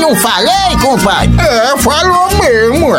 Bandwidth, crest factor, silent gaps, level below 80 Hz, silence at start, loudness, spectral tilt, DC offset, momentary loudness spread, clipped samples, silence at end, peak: 17 kHz; 8 dB; none; -22 dBFS; 0 s; -9 LUFS; -4 dB/octave; under 0.1%; 1 LU; under 0.1%; 0 s; 0 dBFS